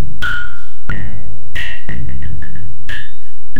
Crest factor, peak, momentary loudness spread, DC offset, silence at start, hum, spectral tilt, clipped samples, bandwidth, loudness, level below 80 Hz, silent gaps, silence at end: 16 dB; -2 dBFS; 12 LU; 70%; 0 s; none; -5.5 dB/octave; under 0.1%; 16 kHz; -26 LUFS; -30 dBFS; none; 0 s